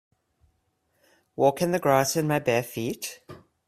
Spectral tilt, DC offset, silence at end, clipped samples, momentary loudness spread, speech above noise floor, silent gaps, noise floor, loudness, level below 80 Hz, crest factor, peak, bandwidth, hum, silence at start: -5 dB/octave; under 0.1%; 0.3 s; under 0.1%; 14 LU; 48 dB; none; -72 dBFS; -25 LUFS; -64 dBFS; 20 dB; -6 dBFS; 16 kHz; none; 1.4 s